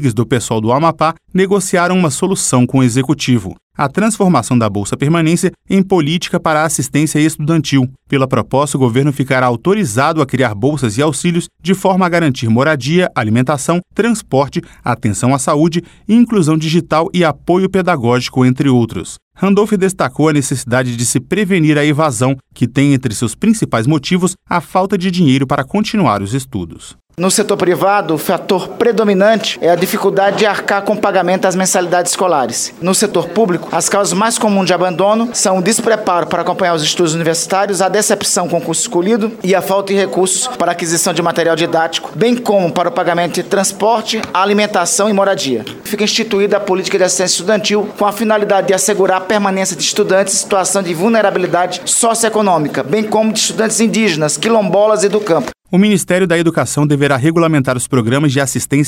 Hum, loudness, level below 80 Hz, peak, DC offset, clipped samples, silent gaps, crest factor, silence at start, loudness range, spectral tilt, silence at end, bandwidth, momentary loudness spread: none; -13 LUFS; -48 dBFS; 0 dBFS; under 0.1%; under 0.1%; 3.63-3.70 s, 19.22-19.31 s; 12 dB; 0 s; 1 LU; -4.5 dB/octave; 0 s; 17 kHz; 4 LU